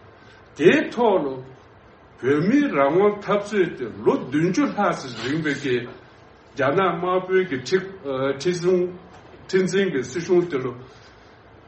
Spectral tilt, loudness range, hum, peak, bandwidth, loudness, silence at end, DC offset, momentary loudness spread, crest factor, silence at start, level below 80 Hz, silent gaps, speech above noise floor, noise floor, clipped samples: -6 dB/octave; 3 LU; none; -2 dBFS; 8.4 kHz; -22 LUFS; 0.7 s; under 0.1%; 10 LU; 20 dB; 0.55 s; -60 dBFS; none; 28 dB; -49 dBFS; under 0.1%